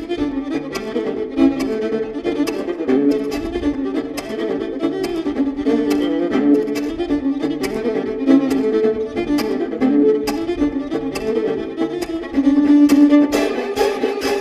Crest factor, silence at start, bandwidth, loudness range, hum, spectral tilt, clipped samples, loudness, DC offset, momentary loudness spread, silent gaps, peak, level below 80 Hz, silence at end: 16 dB; 0 s; 14.5 kHz; 5 LU; none; -5.5 dB/octave; under 0.1%; -18 LUFS; under 0.1%; 9 LU; none; -2 dBFS; -44 dBFS; 0 s